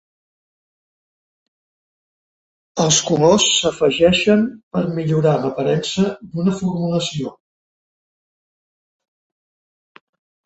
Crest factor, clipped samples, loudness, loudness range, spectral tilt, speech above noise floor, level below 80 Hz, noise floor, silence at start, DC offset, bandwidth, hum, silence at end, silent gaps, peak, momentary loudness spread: 18 dB; under 0.1%; -17 LUFS; 10 LU; -4 dB/octave; over 73 dB; -52 dBFS; under -90 dBFS; 2.75 s; under 0.1%; 8.2 kHz; none; 3.15 s; 4.63-4.71 s; -2 dBFS; 9 LU